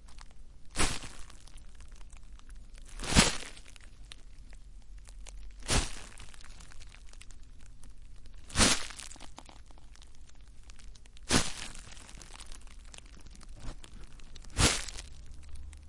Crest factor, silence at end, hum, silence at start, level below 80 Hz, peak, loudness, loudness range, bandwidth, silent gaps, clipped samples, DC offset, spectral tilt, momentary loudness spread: 28 dB; 0 s; none; 0 s; -44 dBFS; -8 dBFS; -30 LUFS; 7 LU; 11.5 kHz; none; under 0.1%; under 0.1%; -2.5 dB/octave; 27 LU